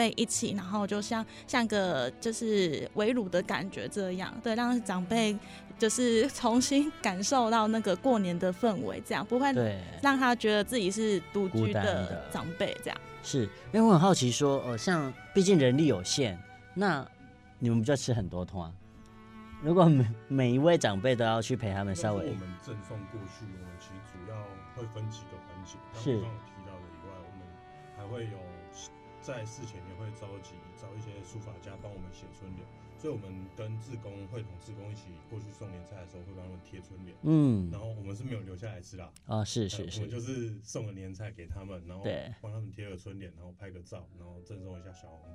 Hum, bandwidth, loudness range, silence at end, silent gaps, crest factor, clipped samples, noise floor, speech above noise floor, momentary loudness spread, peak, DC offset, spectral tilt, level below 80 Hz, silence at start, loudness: none; 15 kHz; 16 LU; 0 s; none; 22 dB; under 0.1%; -52 dBFS; 21 dB; 21 LU; -8 dBFS; under 0.1%; -5.5 dB/octave; -58 dBFS; 0 s; -30 LUFS